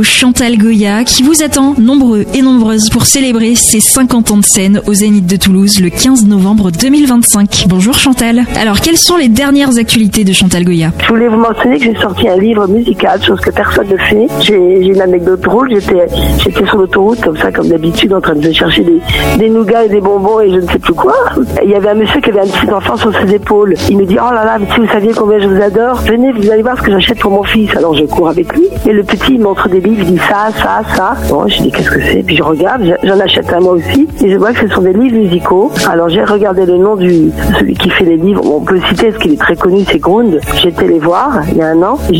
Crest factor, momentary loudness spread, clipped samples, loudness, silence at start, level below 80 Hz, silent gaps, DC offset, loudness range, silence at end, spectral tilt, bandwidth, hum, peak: 8 dB; 4 LU; under 0.1%; -8 LUFS; 0 s; -26 dBFS; none; under 0.1%; 3 LU; 0 s; -4 dB/octave; 17 kHz; none; 0 dBFS